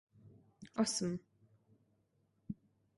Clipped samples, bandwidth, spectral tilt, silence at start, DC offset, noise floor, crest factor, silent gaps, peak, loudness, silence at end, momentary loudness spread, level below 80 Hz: under 0.1%; 11.5 kHz; -4 dB/octave; 0.25 s; under 0.1%; -77 dBFS; 22 dB; none; -22 dBFS; -40 LUFS; 0.45 s; 16 LU; -74 dBFS